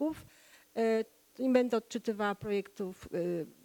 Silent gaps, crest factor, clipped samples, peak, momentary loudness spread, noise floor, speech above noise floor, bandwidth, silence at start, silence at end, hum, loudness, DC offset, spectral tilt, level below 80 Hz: none; 18 dB; under 0.1%; -16 dBFS; 13 LU; -60 dBFS; 28 dB; 19 kHz; 0 s; 0.15 s; none; -34 LUFS; under 0.1%; -6 dB/octave; -70 dBFS